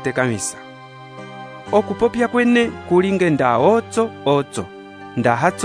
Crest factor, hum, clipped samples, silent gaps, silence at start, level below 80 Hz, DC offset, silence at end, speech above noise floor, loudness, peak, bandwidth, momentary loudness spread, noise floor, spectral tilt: 18 dB; none; under 0.1%; none; 0 s; -54 dBFS; under 0.1%; 0 s; 21 dB; -18 LUFS; 0 dBFS; 11 kHz; 21 LU; -38 dBFS; -5.5 dB/octave